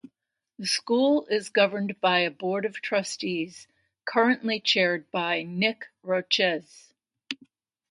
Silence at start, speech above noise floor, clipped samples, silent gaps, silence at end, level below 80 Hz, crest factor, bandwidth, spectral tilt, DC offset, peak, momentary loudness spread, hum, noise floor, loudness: 0.6 s; 51 dB; under 0.1%; none; 0.55 s; -78 dBFS; 20 dB; 11.5 kHz; -3.5 dB/octave; under 0.1%; -6 dBFS; 13 LU; none; -77 dBFS; -25 LUFS